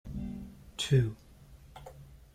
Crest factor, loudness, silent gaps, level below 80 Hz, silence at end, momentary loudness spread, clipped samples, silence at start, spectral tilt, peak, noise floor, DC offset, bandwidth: 18 dB; -32 LUFS; none; -52 dBFS; 0.2 s; 24 LU; under 0.1%; 0.05 s; -6 dB/octave; -16 dBFS; -55 dBFS; under 0.1%; 14.5 kHz